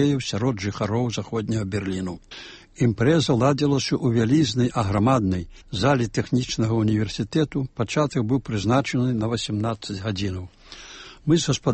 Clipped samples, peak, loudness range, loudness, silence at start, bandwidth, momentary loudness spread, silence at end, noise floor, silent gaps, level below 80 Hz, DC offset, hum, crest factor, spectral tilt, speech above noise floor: under 0.1%; -6 dBFS; 4 LU; -23 LUFS; 0 s; 8.8 kHz; 12 LU; 0 s; -43 dBFS; none; -48 dBFS; under 0.1%; none; 16 dB; -6 dB/octave; 20 dB